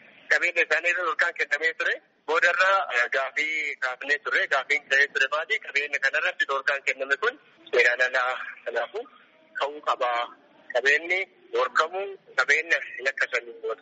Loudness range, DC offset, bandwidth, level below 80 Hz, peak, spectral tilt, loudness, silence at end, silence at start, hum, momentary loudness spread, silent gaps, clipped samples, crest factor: 3 LU; under 0.1%; 8 kHz; -86 dBFS; -6 dBFS; 3.5 dB/octave; -24 LUFS; 0.05 s; 0.3 s; none; 9 LU; none; under 0.1%; 20 dB